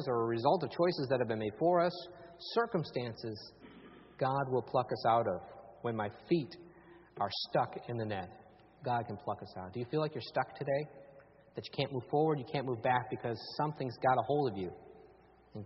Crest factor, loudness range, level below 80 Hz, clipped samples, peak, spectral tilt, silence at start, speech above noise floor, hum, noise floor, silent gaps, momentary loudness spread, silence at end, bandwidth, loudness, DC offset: 22 dB; 5 LU; -70 dBFS; under 0.1%; -14 dBFS; -5 dB/octave; 0 s; 27 dB; none; -62 dBFS; none; 16 LU; 0 s; 5.8 kHz; -35 LUFS; under 0.1%